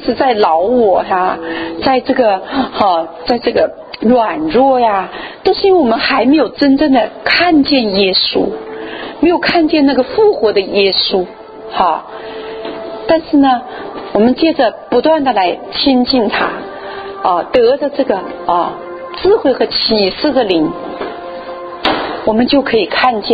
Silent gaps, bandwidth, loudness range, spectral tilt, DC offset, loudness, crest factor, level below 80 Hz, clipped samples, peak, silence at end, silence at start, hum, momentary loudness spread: none; 5 kHz; 3 LU; -7.5 dB/octave; under 0.1%; -12 LUFS; 12 dB; -44 dBFS; under 0.1%; 0 dBFS; 0 s; 0 s; none; 14 LU